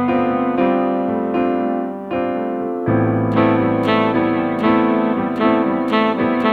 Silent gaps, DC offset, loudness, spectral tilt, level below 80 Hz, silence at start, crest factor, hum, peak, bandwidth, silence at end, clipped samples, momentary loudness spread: none; under 0.1%; -17 LUFS; -8.5 dB/octave; -50 dBFS; 0 s; 16 dB; none; 0 dBFS; 5 kHz; 0 s; under 0.1%; 6 LU